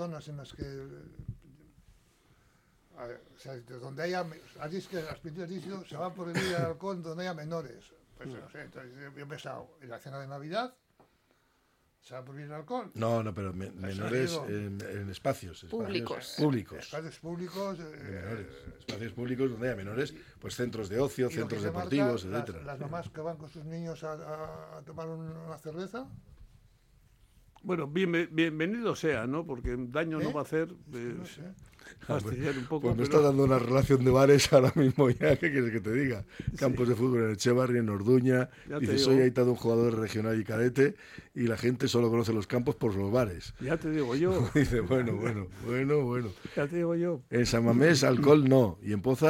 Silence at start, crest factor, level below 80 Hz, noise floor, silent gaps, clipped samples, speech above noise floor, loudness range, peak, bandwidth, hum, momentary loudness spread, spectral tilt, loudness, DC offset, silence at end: 0 s; 22 dB; -54 dBFS; -71 dBFS; none; under 0.1%; 41 dB; 17 LU; -8 dBFS; 16.5 kHz; none; 20 LU; -6 dB/octave; -30 LUFS; under 0.1%; 0 s